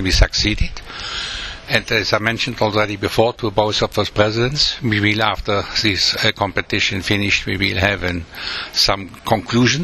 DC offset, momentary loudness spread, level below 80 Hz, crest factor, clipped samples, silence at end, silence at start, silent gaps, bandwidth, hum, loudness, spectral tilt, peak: under 0.1%; 9 LU; -30 dBFS; 18 dB; under 0.1%; 0 s; 0 s; none; 13.5 kHz; none; -18 LUFS; -4 dB/octave; 0 dBFS